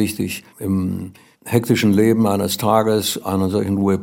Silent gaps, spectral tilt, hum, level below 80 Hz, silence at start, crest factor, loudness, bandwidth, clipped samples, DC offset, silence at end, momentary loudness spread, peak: none; -5.5 dB/octave; none; -60 dBFS; 0 s; 16 dB; -18 LUFS; 17 kHz; under 0.1%; under 0.1%; 0 s; 11 LU; -2 dBFS